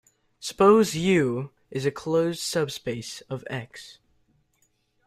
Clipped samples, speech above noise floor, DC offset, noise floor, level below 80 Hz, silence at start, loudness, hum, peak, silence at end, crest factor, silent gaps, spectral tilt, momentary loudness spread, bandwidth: under 0.1%; 45 dB; under 0.1%; -69 dBFS; -60 dBFS; 0.4 s; -25 LUFS; none; -6 dBFS; 1.15 s; 20 dB; none; -5 dB/octave; 17 LU; 15.5 kHz